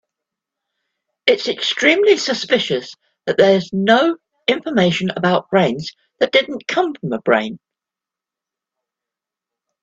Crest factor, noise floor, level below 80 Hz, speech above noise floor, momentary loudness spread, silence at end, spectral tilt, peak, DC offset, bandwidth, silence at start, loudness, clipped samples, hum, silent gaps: 18 dB; -87 dBFS; -62 dBFS; 70 dB; 9 LU; 2.25 s; -4.5 dB/octave; 0 dBFS; under 0.1%; 7.8 kHz; 1.25 s; -17 LUFS; under 0.1%; none; none